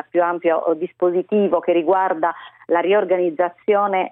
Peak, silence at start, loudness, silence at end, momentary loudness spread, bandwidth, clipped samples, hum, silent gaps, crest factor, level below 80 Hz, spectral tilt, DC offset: -4 dBFS; 0.15 s; -19 LUFS; 0.05 s; 5 LU; 3.8 kHz; under 0.1%; none; none; 14 dB; -68 dBFS; -10 dB/octave; under 0.1%